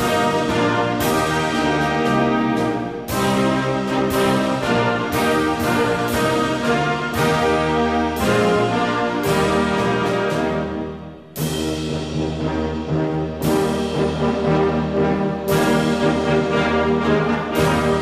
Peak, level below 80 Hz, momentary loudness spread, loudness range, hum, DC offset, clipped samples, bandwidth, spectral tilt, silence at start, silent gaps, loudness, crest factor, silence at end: -6 dBFS; -40 dBFS; 5 LU; 4 LU; none; 0.1%; under 0.1%; 15.5 kHz; -5.5 dB/octave; 0 s; none; -19 LUFS; 12 dB; 0 s